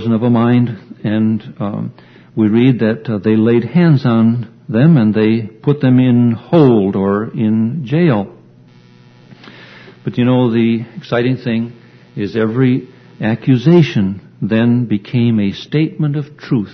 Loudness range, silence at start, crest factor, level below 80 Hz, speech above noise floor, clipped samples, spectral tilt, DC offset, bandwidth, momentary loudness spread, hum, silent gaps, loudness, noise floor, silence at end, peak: 5 LU; 0 s; 14 dB; -54 dBFS; 30 dB; under 0.1%; -9.5 dB/octave; under 0.1%; 6.2 kHz; 11 LU; none; none; -14 LUFS; -43 dBFS; 0 s; 0 dBFS